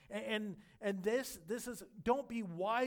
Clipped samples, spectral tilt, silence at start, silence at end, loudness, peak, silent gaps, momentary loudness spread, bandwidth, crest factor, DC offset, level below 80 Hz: under 0.1%; -4.5 dB/octave; 0.1 s; 0 s; -40 LUFS; -20 dBFS; none; 7 LU; 19 kHz; 18 dB; under 0.1%; -70 dBFS